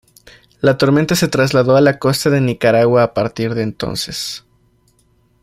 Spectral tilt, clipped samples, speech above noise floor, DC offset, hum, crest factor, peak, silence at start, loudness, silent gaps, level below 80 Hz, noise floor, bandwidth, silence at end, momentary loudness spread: -5.5 dB/octave; under 0.1%; 42 dB; under 0.1%; none; 14 dB; -2 dBFS; 0.65 s; -15 LUFS; none; -48 dBFS; -57 dBFS; 16 kHz; 1.05 s; 10 LU